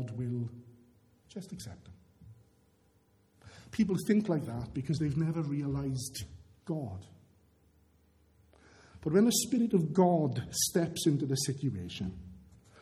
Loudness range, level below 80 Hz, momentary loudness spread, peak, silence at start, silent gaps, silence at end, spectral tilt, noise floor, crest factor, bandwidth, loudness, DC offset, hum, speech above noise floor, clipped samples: 14 LU; -60 dBFS; 21 LU; -12 dBFS; 0 s; none; 0.4 s; -5.5 dB/octave; -68 dBFS; 20 dB; 15 kHz; -32 LUFS; under 0.1%; none; 37 dB; under 0.1%